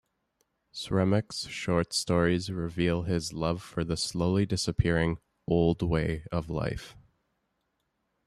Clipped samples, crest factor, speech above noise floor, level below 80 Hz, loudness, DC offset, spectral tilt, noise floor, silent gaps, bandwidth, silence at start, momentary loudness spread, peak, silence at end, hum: under 0.1%; 18 dB; 50 dB; -48 dBFS; -29 LUFS; under 0.1%; -5.5 dB/octave; -78 dBFS; none; 13 kHz; 0.75 s; 8 LU; -10 dBFS; 1.3 s; none